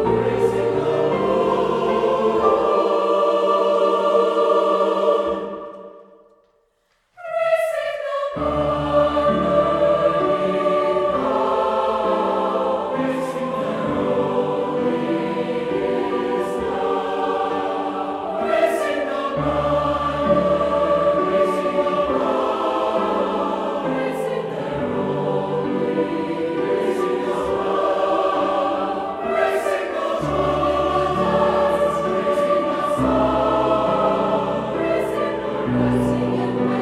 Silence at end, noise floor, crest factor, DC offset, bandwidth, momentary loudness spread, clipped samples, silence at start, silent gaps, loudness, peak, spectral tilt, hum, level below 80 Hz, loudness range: 0 s; -65 dBFS; 18 dB; under 0.1%; 13.5 kHz; 6 LU; under 0.1%; 0 s; none; -20 LUFS; -2 dBFS; -6.5 dB/octave; none; -46 dBFS; 4 LU